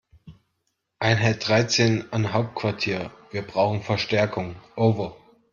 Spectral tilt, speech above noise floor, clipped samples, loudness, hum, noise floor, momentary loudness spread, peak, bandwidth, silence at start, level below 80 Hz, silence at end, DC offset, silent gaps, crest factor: -5 dB/octave; 53 dB; under 0.1%; -24 LUFS; none; -76 dBFS; 11 LU; -4 dBFS; 7.4 kHz; 0.25 s; -58 dBFS; 0.4 s; under 0.1%; none; 20 dB